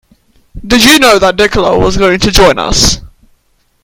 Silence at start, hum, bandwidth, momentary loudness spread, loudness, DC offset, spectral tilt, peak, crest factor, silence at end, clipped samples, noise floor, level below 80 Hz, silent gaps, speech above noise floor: 0.55 s; none; over 20 kHz; 6 LU; -7 LUFS; under 0.1%; -3 dB/octave; 0 dBFS; 10 dB; 0.75 s; 2%; -53 dBFS; -22 dBFS; none; 46 dB